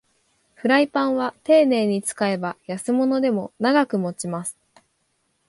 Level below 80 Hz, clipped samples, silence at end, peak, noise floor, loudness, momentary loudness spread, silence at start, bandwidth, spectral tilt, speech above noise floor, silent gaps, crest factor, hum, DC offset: -70 dBFS; under 0.1%; 0.95 s; -4 dBFS; -70 dBFS; -21 LUFS; 11 LU; 0.65 s; 11.5 kHz; -5 dB/octave; 49 dB; none; 18 dB; none; under 0.1%